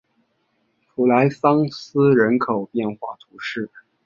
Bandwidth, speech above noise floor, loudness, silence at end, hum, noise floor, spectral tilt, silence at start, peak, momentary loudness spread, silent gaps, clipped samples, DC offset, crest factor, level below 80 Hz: 7.2 kHz; 49 dB; -19 LUFS; 0.4 s; none; -68 dBFS; -8 dB/octave; 1 s; -2 dBFS; 17 LU; none; under 0.1%; under 0.1%; 18 dB; -64 dBFS